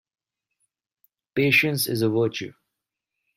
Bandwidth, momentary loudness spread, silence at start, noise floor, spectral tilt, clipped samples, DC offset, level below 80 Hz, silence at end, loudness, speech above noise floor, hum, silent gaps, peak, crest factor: 16 kHz; 15 LU; 1.35 s; -84 dBFS; -4.5 dB/octave; under 0.1%; under 0.1%; -66 dBFS; 0.85 s; -22 LUFS; 62 dB; none; none; -6 dBFS; 20 dB